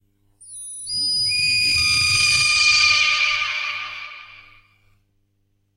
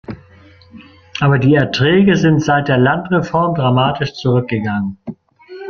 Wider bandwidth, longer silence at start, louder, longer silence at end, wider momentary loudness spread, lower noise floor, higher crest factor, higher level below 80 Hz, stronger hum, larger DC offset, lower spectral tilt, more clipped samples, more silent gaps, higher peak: first, 16 kHz vs 7 kHz; first, 0.4 s vs 0.1 s; about the same, -16 LUFS vs -14 LUFS; first, 1.4 s vs 0 s; first, 20 LU vs 16 LU; first, -67 dBFS vs -44 dBFS; about the same, 16 dB vs 14 dB; about the same, -50 dBFS vs -46 dBFS; first, 50 Hz at -50 dBFS vs none; neither; second, 1 dB/octave vs -7 dB/octave; neither; neither; second, -4 dBFS vs 0 dBFS